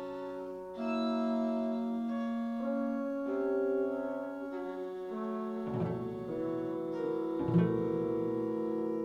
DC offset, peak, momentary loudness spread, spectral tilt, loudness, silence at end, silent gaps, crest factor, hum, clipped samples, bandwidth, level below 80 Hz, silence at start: under 0.1%; -16 dBFS; 8 LU; -9 dB/octave; -35 LUFS; 0 s; none; 18 dB; none; under 0.1%; 7 kHz; -66 dBFS; 0 s